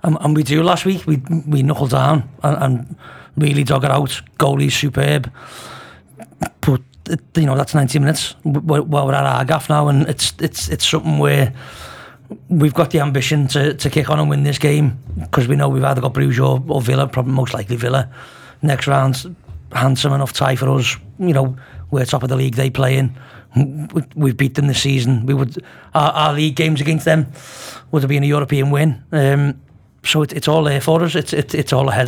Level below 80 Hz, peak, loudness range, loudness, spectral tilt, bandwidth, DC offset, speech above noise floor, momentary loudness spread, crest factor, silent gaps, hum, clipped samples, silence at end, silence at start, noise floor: -44 dBFS; 0 dBFS; 2 LU; -16 LUFS; -6 dB/octave; 16 kHz; under 0.1%; 24 dB; 10 LU; 16 dB; none; none; under 0.1%; 0 s; 0.05 s; -40 dBFS